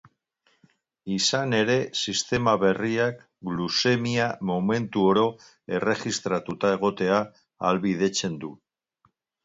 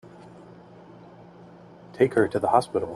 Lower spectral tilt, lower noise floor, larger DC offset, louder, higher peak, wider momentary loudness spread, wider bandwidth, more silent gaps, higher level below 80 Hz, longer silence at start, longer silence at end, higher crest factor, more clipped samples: second, -4.5 dB/octave vs -6.5 dB/octave; first, -69 dBFS vs -48 dBFS; neither; about the same, -25 LUFS vs -23 LUFS; about the same, -6 dBFS vs -4 dBFS; second, 10 LU vs 25 LU; second, 8 kHz vs 12 kHz; neither; about the same, -60 dBFS vs -62 dBFS; first, 1.05 s vs 0.05 s; first, 0.9 s vs 0 s; about the same, 20 dB vs 22 dB; neither